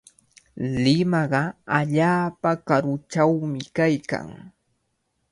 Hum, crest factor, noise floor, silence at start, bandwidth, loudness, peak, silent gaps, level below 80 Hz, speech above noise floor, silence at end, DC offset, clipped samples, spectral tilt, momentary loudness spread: none; 20 dB; -73 dBFS; 0.55 s; 11.5 kHz; -23 LUFS; -4 dBFS; none; -56 dBFS; 51 dB; 0.85 s; under 0.1%; under 0.1%; -6.5 dB/octave; 8 LU